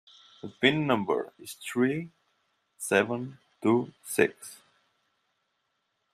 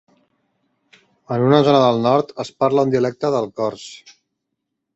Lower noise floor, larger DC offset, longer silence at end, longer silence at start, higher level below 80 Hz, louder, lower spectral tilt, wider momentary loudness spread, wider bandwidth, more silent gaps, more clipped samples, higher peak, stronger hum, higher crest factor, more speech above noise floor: about the same, -78 dBFS vs -78 dBFS; neither; first, 1.6 s vs 1 s; second, 0.45 s vs 1.3 s; second, -72 dBFS vs -60 dBFS; second, -28 LUFS vs -18 LUFS; second, -4.5 dB/octave vs -7 dB/octave; first, 20 LU vs 13 LU; first, 15.5 kHz vs 8.2 kHz; neither; neither; second, -8 dBFS vs -2 dBFS; neither; first, 24 dB vs 18 dB; second, 50 dB vs 60 dB